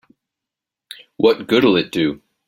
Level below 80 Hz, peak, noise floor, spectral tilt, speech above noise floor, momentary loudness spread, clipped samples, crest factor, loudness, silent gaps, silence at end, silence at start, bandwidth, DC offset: -56 dBFS; -2 dBFS; -85 dBFS; -6 dB/octave; 70 dB; 8 LU; under 0.1%; 18 dB; -17 LUFS; none; 0.3 s; 1.2 s; 16.5 kHz; under 0.1%